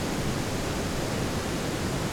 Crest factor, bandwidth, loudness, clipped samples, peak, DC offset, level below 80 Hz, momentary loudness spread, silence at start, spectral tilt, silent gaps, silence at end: 12 dB; over 20 kHz; -30 LUFS; under 0.1%; -16 dBFS; under 0.1%; -40 dBFS; 1 LU; 0 s; -4.5 dB/octave; none; 0 s